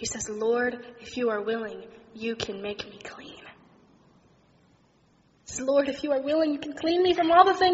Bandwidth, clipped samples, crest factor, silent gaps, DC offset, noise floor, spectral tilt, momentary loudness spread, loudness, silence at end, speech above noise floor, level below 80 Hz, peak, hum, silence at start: 8 kHz; under 0.1%; 24 dB; none; under 0.1%; -63 dBFS; -2 dB/octave; 22 LU; -26 LUFS; 0 s; 37 dB; -60 dBFS; -4 dBFS; none; 0 s